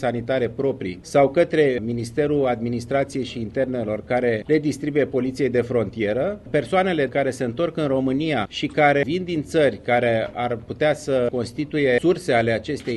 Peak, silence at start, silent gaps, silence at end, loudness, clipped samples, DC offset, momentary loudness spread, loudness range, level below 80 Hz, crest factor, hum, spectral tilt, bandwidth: -4 dBFS; 0 s; none; 0 s; -22 LUFS; under 0.1%; under 0.1%; 7 LU; 2 LU; -50 dBFS; 16 dB; none; -6.5 dB/octave; 12.5 kHz